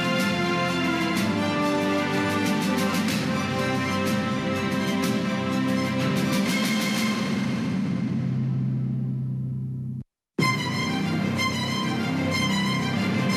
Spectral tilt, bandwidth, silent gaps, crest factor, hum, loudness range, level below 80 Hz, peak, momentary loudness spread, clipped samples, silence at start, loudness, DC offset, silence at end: -5 dB/octave; 15.5 kHz; none; 14 dB; none; 3 LU; -58 dBFS; -10 dBFS; 4 LU; under 0.1%; 0 s; -25 LUFS; under 0.1%; 0 s